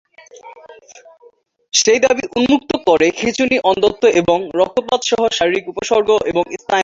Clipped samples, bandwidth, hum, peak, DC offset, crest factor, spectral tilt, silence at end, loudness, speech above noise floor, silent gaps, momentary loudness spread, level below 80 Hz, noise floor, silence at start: under 0.1%; 7.8 kHz; none; 0 dBFS; under 0.1%; 16 dB; -3 dB/octave; 0 s; -15 LUFS; 35 dB; none; 5 LU; -50 dBFS; -50 dBFS; 0.35 s